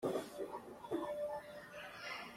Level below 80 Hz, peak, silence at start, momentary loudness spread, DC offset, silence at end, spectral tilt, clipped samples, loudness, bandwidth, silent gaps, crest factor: -76 dBFS; -26 dBFS; 0 s; 9 LU; under 0.1%; 0 s; -4.5 dB/octave; under 0.1%; -45 LUFS; 16 kHz; none; 18 dB